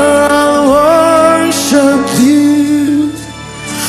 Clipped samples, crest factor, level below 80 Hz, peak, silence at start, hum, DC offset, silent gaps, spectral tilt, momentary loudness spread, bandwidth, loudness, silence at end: 1%; 10 dB; -42 dBFS; 0 dBFS; 0 s; none; under 0.1%; none; -4 dB/octave; 12 LU; 14.5 kHz; -9 LUFS; 0 s